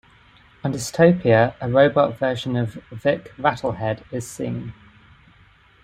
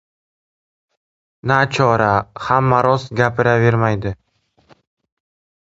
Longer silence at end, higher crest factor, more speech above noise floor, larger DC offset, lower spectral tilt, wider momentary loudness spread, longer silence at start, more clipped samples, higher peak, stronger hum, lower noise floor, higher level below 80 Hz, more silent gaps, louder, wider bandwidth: second, 1.1 s vs 1.65 s; about the same, 20 dB vs 18 dB; second, 33 dB vs 45 dB; neither; about the same, -6 dB/octave vs -7 dB/octave; first, 13 LU vs 10 LU; second, 0.65 s vs 1.45 s; neither; about the same, -2 dBFS vs 0 dBFS; neither; second, -53 dBFS vs -61 dBFS; second, -52 dBFS vs -46 dBFS; neither; second, -21 LUFS vs -16 LUFS; first, 15.5 kHz vs 7.8 kHz